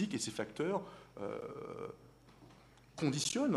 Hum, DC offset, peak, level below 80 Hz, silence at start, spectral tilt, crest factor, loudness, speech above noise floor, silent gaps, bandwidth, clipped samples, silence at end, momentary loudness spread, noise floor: none; under 0.1%; -20 dBFS; -72 dBFS; 0 s; -4.5 dB/octave; 20 dB; -39 LUFS; 23 dB; none; 13.5 kHz; under 0.1%; 0 s; 23 LU; -61 dBFS